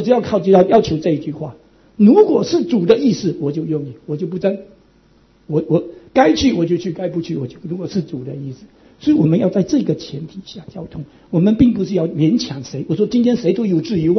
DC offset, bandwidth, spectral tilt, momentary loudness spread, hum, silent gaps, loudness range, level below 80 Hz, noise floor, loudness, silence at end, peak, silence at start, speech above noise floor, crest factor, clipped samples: under 0.1%; 6.4 kHz; -7.5 dB/octave; 17 LU; none; none; 5 LU; -48 dBFS; -52 dBFS; -16 LUFS; 0 s; 0 dBFS; 0 s; 36 dB; 16 dB; under 0.1%